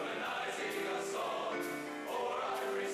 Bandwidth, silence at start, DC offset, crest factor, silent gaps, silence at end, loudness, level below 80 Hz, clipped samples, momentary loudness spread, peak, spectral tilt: 15 kHz; 0 s; under 0.1%; 10 dB; none; 0 s; -38 LUFS; -80 dBFS; under 0.1%; 3 LU; -28 dBFS; -2.5 dB/octave